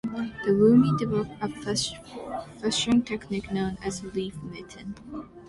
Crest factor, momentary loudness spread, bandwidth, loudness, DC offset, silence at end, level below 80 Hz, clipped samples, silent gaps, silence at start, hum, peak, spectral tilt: 18 dB; 20 LU; 11.5 kHz; -26 LUFS; under 0.1%; 0 s; -52 dBFS; under 0.1%; none; 0.05 s; none; -10 dBFS; -5.5 dB/octave